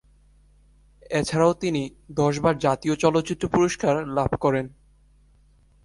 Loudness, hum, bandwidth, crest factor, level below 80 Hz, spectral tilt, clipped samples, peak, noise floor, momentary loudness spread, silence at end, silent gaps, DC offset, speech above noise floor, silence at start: -23 LUFS; 50 Hz at -50 dBFS; 11.5 kHz; 18 dB; -48 dBFS; -6 dB/octave; under 0.1%; -6 dBFS; -57 dBFS; 7 LU; 1.15 s; none; under 0.1%; 35 dB; 1.1 s